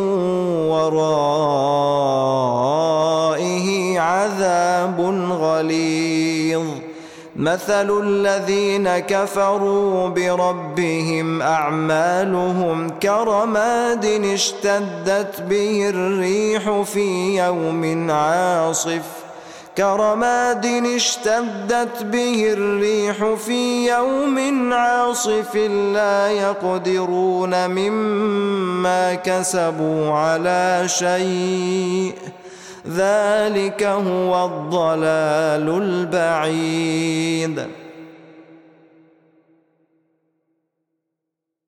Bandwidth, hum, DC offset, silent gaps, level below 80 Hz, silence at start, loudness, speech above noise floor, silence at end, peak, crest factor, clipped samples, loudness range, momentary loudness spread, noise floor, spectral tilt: 16 kHz; none; under 0.1%; none; -62 dBFS; 0 s; -19 LUFS; 63 dB; 3.25 s; -8 dBFS; 10 dB; under 0.1%; 2 LU; 4 LU; -81 dBFS; -4.5 dB/octave